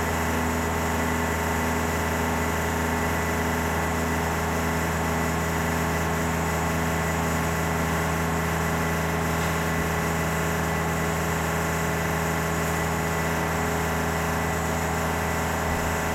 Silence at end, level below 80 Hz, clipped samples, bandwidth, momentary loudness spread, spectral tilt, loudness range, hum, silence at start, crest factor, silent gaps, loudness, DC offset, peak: 0 s; -40 dBFS; under 0.1%; 16.5 kHz; 1 LU; -5 dB/octave; 0 LU; none; 0 s; 12 dB; none; -25 LUFS; under 0.1%; -12 dBFS